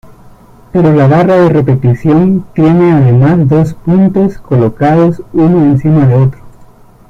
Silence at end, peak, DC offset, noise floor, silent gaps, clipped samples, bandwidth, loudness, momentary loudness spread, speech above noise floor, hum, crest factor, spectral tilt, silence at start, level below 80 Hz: 0.45 s; 0 dBFS; under 0.1%; -37 dBFS; none; under 0.1%; 6.4 kHz; -8 LUFS; 5 LU; 30 dB; none; 8 dB; -10 dB/octave; 0.75 s; -36 dBFS